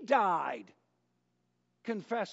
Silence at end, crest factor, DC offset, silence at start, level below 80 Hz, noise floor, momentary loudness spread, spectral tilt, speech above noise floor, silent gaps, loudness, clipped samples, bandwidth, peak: 0 s; 20 dB; under 0.1%; 0 s; under -90 dBFS; -78 dBFS; 17 LU; -3 dB/octave; 46 dB; none; -33 LUFS; under 0.1%; 7.6 kHz; -14 dBFS